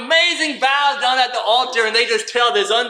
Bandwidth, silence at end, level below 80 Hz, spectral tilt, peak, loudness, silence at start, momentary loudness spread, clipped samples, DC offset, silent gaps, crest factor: 13.5 kHz; 0 s; -78 dBFS; 0 dB/octave; -2 dBFS; -16 LUFS; 0 s; 3 LU; under 0.1%; under 0.1%; none; 14 dB